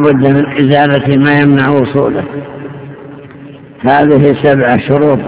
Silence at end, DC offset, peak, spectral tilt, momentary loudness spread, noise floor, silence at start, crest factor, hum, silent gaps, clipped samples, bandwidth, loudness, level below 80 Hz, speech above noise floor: 0 s; 0.3%; 0 dBFS; -11.5 dB/octave; 19 LU; -31 dBFS; 0 s; 10 dB; none; none; 2%; 4 kHz; -9 LUFS; -42 dBFS; 23 dB